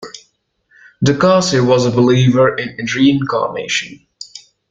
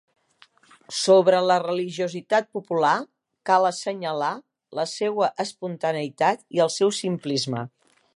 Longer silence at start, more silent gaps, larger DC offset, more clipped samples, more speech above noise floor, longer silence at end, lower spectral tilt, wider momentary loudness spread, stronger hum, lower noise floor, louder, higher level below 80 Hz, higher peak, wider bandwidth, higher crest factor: second, 0 s vs 0.9 s; neither; neither; neither; first, 47 dB vs 35 dB; second, 0.3 s vs 0.5 s; first, -5.5 dB/octave vs -4 dB/octave; first, 21 LU vs 11 LU; neither; about the same, -60 dBFS vs -58 dBFS; first, -14 LUFS vs -23 LUFS; first, -50 dBFS vs -76 dBFS; first, 0 dBFS vs -4 dBFS; second, 9 kHz vs 11.5 kHz; about the same, 14 dB vs 18 dB